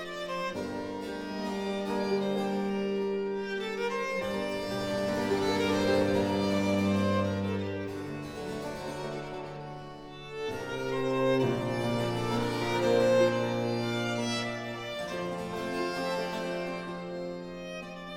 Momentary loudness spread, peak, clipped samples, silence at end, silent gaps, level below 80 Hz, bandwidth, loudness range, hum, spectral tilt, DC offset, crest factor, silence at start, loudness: 11 LU; -12 dBFS; under 0.1%; 0 s; none; -58 dBFS; 16 kHz; 7 LU; none; -5.5 dB/octave; under 0.1%; 18 dB; 0 s; -31 LUFS